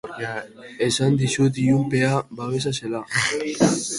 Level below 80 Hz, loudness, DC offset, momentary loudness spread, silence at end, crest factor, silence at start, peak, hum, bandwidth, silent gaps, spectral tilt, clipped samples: -56 dBFS; -22 LUFS; under 0.1%; 10 LU; 0 s; 18 dB; 0.05 s; -4 dBFS; none; 11.5 kHz; none; -5 dB/octave; under 0.1%